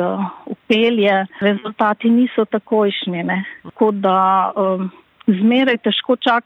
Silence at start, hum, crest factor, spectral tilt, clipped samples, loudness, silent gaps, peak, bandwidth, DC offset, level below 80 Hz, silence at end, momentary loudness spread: 0 s; none; 14 dB; -7.5 dB/octave; under 0.1%; -17 LUFS; none; -4 dBFS; 6 kHz; under 0.1%; -68 dBFS; 0.05 s; 9 LU